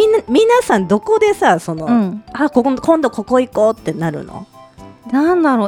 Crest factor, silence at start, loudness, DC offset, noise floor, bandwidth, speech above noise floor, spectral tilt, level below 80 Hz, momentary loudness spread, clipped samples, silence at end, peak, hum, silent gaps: 14 dB; 0 s; -15 LUFS; under 0.1%; -39 dBFS; 16 kHz; 25 dB; -6 dB/octave; -48 dBFS; 10 LU; under 0.1%; 0 s; 0 dBFS; none; none